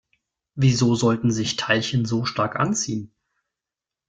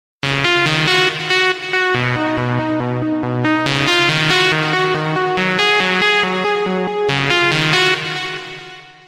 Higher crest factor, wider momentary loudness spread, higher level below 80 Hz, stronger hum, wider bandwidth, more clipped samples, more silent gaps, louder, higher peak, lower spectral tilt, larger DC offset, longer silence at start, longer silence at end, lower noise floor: about the same, 20 dB vs 16 dB; about the same, 7 LU vs 7 LU; second, -54 dBFS vs -48 dBFS; neither; second, 9.2 kHz vs 16 kHz; neither; neither; second, -22 LUFS vs -15 LUFS; second, -4 dBFS vs 0 dBFS; about the same, -5 dB/octave vs -4 dB/octave; neither; first, 0.55 s vs 0.25 s; first, 1.05 s vs 0.15 s; first, -88 dBFS vs -36 dBFS